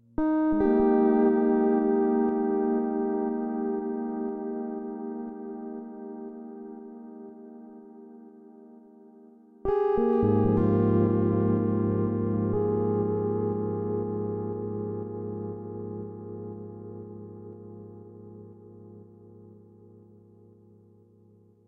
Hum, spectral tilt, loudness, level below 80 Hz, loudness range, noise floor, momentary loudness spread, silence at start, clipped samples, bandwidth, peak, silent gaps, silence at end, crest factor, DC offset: none; -12.5 dB/octave; -27 LUFS; -54 dBFS; 20 LU; -58 dBFS; 22 LU; 0.2 s; under 0.1%; 3.7 kHz; -12 dBFS; none; 2.1 s; 16 dB; under 0.1%